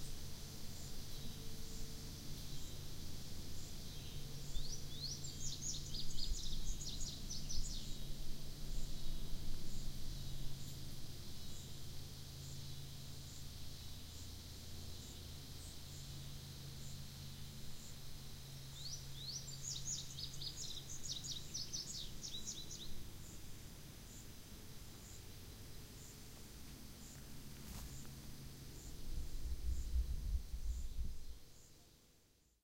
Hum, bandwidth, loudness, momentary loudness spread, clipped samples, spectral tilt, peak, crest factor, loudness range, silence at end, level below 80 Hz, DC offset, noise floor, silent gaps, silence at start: none; 16 kHz; -49 LUFS; 10 LU; under 0.1%; -3 dB/octave; -26 dBFS; 18 dB; 9 LU; 0.4 s; -48 dBFS; under 0.1%; -72 dBFS; none; 0 s